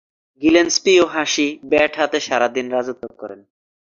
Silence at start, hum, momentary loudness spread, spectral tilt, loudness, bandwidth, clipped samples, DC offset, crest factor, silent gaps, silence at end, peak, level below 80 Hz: 0.4 s; none; 17 LU; -2.5 dB/octave; -17 LUFS; 7.6 kHz; under 0.1%; under 0.1%; 18 dB; none; 0.65 s; -2 dBFS; -56 dBFS